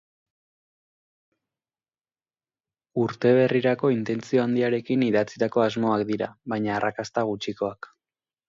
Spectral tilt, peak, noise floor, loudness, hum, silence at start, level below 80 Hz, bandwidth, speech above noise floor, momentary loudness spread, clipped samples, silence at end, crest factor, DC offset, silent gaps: -7 dB/octave; -8 dBFS; under -90 dBFS; -24 LUFS; none; 2.95 s; -66 dBFS; 7.6 kHz; over 66 dB; 9 LU; under 0.1%; 0.75 s; 18 dB; under 0.1%; none